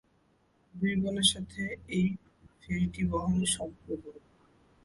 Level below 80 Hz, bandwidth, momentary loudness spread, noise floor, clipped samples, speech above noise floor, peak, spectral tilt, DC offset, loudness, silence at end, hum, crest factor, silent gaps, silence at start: -52 dBFS; 11.5 kHz; 14 LU; -69 dBFS; under 0.1%; 38 dB; -12 dBFS; -4 dB/octave; under 0.1%; -31 LUFS; 0.65 s; none; 20 dB; none; 0.75 s